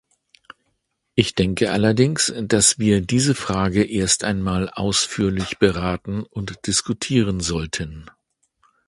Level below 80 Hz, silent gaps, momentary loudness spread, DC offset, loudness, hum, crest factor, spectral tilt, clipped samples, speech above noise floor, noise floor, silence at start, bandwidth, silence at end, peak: -42 dBFS; none; 11 LU; under 0.1%; -20 LUFS; none; 20 dB; -4 dB/octave; under 0.1%; 52 dB; -72 dBFS; 1.15 s; 11.5 kHz; 0.8 s; 0 dBFS